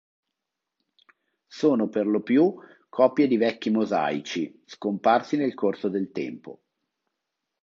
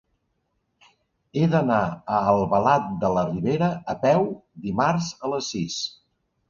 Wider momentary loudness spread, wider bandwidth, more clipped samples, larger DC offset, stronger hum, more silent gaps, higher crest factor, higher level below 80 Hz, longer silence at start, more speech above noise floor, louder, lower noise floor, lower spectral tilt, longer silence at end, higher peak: first, 12 LU vs 9 LU; about the same, 7.4 kHz vs 7.4 kHz; neither; neither; neither; neither; about the same, 20 dB vs 20 dB; second, -76 dBFS vs -54 dBFS; first, 1.55 s vs 1.35 s; first, 61 dB vs 51 dB; about the same, -25 LUFS vs -23 LUFS; first, -85 dBFS vs -73 dBFS; about the same, -6.5 dB/octave vs -6 dB/octave; first, 1.1 s vs 0.6 s; about the same, -6 dBFS vs -4 dBFS